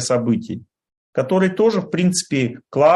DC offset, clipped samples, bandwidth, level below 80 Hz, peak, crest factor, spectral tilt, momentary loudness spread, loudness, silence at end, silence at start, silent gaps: under 0.1%; under 0.1%; 12.5 kHz; -60 dBFS; -2 dBFS; 16 dB; -5.5 dB/octave; 10 LU; -19 LUFS; 0 s; 0 s; 0.97-1.13 s